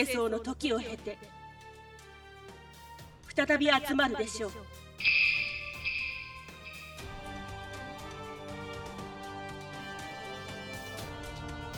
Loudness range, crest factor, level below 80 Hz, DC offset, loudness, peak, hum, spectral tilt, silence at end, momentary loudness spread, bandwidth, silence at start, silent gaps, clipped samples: 13 LU; 24 dB; -54 dBFS; under 0.1%; -33 LUFS; -12 dBFS; none; -3.5 dB/octave; 0 s; 24 LU; 19.5 kHz; 0 s; none; under 0.1%